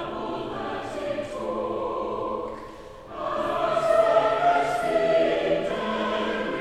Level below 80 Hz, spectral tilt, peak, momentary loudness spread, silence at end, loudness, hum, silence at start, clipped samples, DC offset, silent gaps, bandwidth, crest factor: -52 dBFS; -5 dB/octave; -8 dBFS; 12 LU; 0 s; -25 LUFS; none; 0 s; under 0.1%; under 0.1%; none; 12.5 kHz; 16 dB